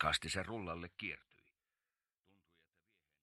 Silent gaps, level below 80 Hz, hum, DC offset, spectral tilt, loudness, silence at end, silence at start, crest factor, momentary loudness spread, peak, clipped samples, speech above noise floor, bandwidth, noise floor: none; -64 dBFS; none; under 0.1%; -3 dB/octave; -41 LUFS; 2.05 s; 0 s; 28 dB; 10 LU; -18 dBFS; under 0.1%; over 48 dB; 13 kHz; under -90 dBFS